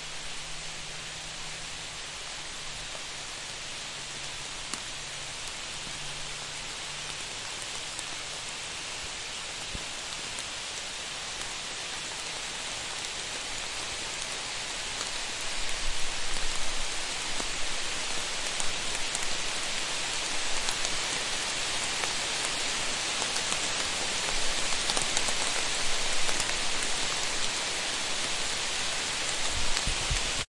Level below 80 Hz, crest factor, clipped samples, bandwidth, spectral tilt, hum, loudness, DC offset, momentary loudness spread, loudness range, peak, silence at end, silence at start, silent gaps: -44 dBFS; 26 dB; under 0.1%; 11.5 kHz; -0.5 dB/octave; none; -31 LUFS; under 0.1%; 8 LU; 8 LU; -6 dBFS; 0.15 s; 0 s; none